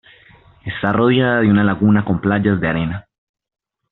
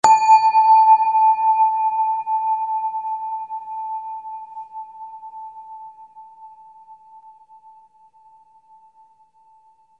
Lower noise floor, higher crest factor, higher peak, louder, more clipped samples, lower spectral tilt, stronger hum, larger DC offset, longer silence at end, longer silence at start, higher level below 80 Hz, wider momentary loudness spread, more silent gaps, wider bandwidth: second, -48 dBFS vs -55 dBFS; second, 14 dB vs 20 dB; about the same, -2 dBFS vs 0 dBFS; about the same, -16 LUFS vs -17 LUFS; neither; first, -6 dB/octave vs -1 dB/octave; neither; neither; second, 0.9 s vs 3.05 s; first, 0.65 s vs 0.05 s; first, -46 dBFS vs -72 dBFS; second, 12 LU vs 24 LU; neither; second, 4.1 kHz vs 9.8 kHz